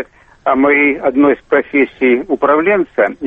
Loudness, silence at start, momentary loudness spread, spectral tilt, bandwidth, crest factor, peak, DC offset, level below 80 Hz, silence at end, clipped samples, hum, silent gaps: -13 LUFS; 0 s; 5 LU; -8 dB/octave; 3.8 kHz; 12 dB; -2 dBFS; under 0.1%; -50 dBFS; 0 s; under 0.1%; none; none